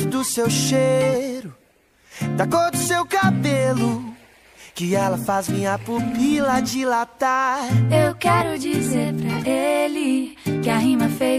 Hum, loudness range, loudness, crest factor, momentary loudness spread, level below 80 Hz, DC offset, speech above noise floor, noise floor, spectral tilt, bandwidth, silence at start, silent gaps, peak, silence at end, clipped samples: none; 2 LU; -20 LUFS; 16 dB; 6 LU; -54 dBFS; under 0.1%; 37 dB; -57 dBFS; -5 dB/octave; 15.5 kHz; 0 s; none; -4 dBFS; 0 s; under 0.1%